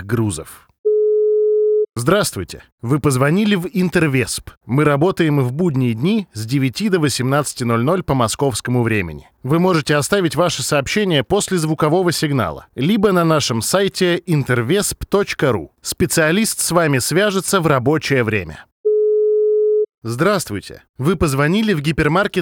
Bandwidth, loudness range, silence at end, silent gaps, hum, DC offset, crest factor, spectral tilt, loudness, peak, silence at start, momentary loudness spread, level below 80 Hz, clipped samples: 20 kHz; 1 LU; 0 s; 0.78-0.84 s, 2.72-2.78 s, 4.57-4.61 s, 18.72-18.84 s, 19.94-20.02 s, 20.89-20.94 s; none; under 0.1%; 16 dB; -5 dB/octave; -17 LUFS; 0 dBFS; 0 s; 7 LU; -44 dBFS; under 0.1%